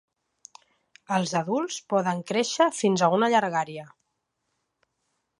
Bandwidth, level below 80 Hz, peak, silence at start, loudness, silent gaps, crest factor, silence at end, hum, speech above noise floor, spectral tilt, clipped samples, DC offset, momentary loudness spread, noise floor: 11.5 kHz; -76 dBFS; -8 dBFS; 1.1 s; -25 LUFS; none; 18 dB; 1.55 s; none; 54 dB; -4.5 dB/octave; under 0.1%; under 0.1%; 7 LU; -78 dBFS